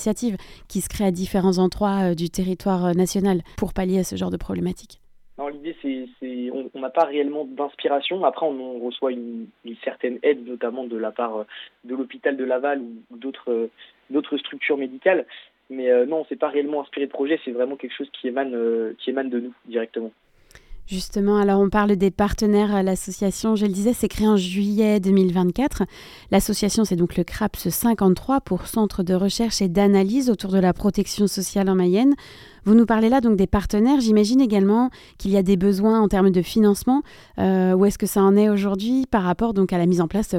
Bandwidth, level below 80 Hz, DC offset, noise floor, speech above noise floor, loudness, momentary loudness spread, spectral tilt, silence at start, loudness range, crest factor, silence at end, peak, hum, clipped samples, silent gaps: 16.5 kHz; -42 dBFS; under 0.1%; -47 dBFS; 26 dB; -21 LUFS; 13 LU; -6 dB/octave; 0 s; 8 LU; 16 dB; 0 s; -4 dBFS; none; under 0.1%; none